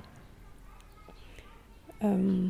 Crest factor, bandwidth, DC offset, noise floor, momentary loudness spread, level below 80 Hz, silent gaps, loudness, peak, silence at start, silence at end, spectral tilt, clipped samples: 14 dB; 12 kHz; under 0.1%; -52 dBFS; 26 LU; -54 dBFS; none; -30 LUFS; -20 dBFS; 0.05 s; 0 s; -9 dB/octave; under 0.1%